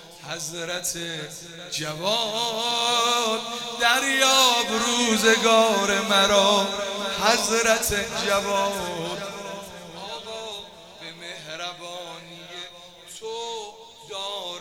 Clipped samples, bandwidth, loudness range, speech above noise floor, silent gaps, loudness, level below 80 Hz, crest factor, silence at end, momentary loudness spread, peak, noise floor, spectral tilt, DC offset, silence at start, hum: under 0.1%; 17.5 kHz; 17 LU; 21 dB; none; -22 LUFS; -54 dBFS; 22 dB; 0 s; 20 LU; -4 dBFS; -44 dBFS; -1.5 dB/octave; under 0.1%; 0 s; none